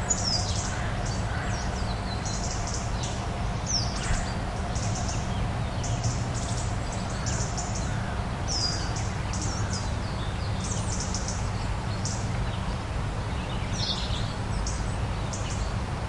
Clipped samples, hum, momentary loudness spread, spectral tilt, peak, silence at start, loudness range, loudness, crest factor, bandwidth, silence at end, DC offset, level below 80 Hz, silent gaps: under 0.1%; none; 4 LU; -4 dB/octave; -12 dBFS; 0 s; 1 LU; -30 LUFS; 16 dB; 11.5 kHz; 0 s; under 0.1%; -34 dBFS; none